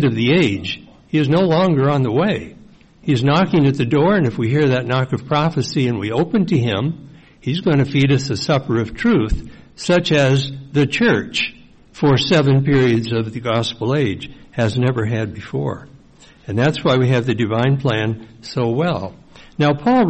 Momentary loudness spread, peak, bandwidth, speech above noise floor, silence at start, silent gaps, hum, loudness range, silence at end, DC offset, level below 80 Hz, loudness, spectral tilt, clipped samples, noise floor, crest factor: 11 LU; -6 dBFS; 8.6 kHz; 30 dB; 0 s; none; none; 3 LU; 0 s; 0.3%; -40 dBFS; -17 LUFS; -6.5 dB/octave; under 0.1%; -46 dBFS; 12 dB